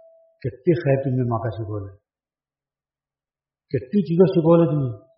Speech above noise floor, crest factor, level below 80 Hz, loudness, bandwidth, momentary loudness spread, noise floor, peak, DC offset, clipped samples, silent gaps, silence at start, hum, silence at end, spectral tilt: over 70 dB; 18 dB; -58 dBFS; -20 LUFS; 5.6 kHz; 16 LU; under -90 dBFS; -4 dBFS; under 0.1%; under 0.1%; none; 0.45 s; none; 0.2 s; -9 dB/octave